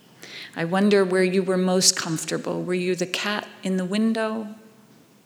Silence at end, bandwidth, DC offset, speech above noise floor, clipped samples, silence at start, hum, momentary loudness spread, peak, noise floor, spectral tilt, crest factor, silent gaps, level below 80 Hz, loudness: 0.65 s; 20 kHz; under 0.1%; 30 dB; under 0.1%; 0.2 s; none; 13 LU; -2 dBFS; -53 dBFS; -4 dB/octave; 22 dB; none; -78 dBFS; -23 LUFS